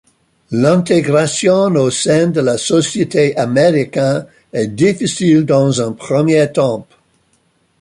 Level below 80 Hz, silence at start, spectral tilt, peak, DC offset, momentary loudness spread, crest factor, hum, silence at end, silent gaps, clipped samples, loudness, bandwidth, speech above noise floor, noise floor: -54 dBFS; 0.5 s; -5.5 dB/octave; 0 dBFS; under 0.1%; 6 LU; 14 dB; none; 1 s; none; under 0.1%; -13 LUFS; 11.5 kHz; 46 dB; -58 dBFS